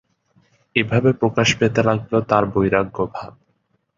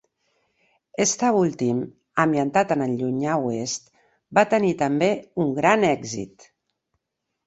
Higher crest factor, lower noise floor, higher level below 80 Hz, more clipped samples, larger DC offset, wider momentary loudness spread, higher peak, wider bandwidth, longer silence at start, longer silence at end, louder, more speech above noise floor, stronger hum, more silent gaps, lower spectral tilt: about the same, 18 dB vs 20 dB; second, -67 dBFS vs -80 dBFS; first, -48 dBFS vs -64 dBFS; neither; neither; about the same, 9 LU vs 10 LU; about the same, -2 dBFS vs -4 dBFS; about the same, 7.8 kHz vs 8.2 kHz; second, 0.75 s vs 1 s; second, 0.7 s vs 1.2 s; first, -19 LUFS vs -22 LUFS; second, 49 dB vs 59 dB; neither; neither; about the same, -5.5 dB/octave vs -5 dB/octave